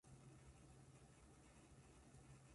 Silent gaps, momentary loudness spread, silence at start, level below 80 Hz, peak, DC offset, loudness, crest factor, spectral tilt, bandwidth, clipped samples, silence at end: none; 2 LU; 0.05 s; -74 dBFS; -52 dBFS; under 0.1%; -67 LUFS; 14 dB; -5 dB/octave; 11.5 kHz; under 0.1%; 0 s